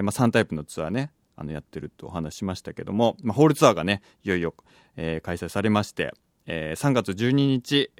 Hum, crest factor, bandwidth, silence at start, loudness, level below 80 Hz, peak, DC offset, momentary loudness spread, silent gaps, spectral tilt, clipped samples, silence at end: none; 24 dB; 17 kHz; 0 s; -25 LUFS; -52 dBFS; -2 dBFS; under 0.1%; 15 LU; none; -5.5 dB/octave; under 0.1%; 0.1 s